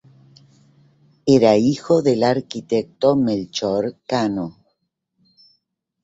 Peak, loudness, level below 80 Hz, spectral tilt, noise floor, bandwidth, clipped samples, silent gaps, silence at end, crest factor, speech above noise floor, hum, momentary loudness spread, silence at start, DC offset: -2 dBFS; -19 LUFS; -58 dBFS; -6.5 dB/octave; -73 dBFS; 8 kHz; under 0.1%; none; 1.55 s; 18 dB; 55 dB; none; 9 LU; 1.25 s; under 0.1%